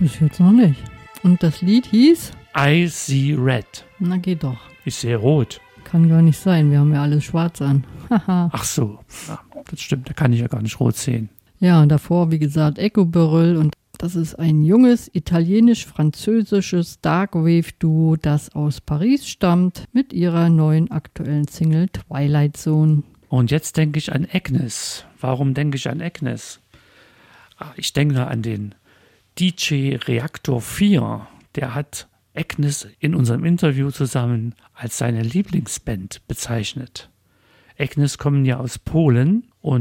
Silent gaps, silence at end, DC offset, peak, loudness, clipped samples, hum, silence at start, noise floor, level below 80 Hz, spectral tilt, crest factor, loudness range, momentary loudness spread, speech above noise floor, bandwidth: none; 0 s; under 0.1%; -4 dBFS; -19 LUFS; under 0.1%; none; 0 s; -57 dBFS; -46 dBFS; -6.5 dB/octave; 14 dB; 7 LU; 14 LU; 39 dB; 16.5 kHz